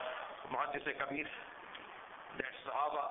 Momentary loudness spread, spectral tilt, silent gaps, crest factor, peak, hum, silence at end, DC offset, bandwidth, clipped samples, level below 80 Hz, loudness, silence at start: 12 LU; 2 dB/octave; none; 20 dB; -20 dBFS; none; 0 s; under 0.1%; 3.9 kHz; under 0.1%; -74 dBFS; -41 LUFS; 0 s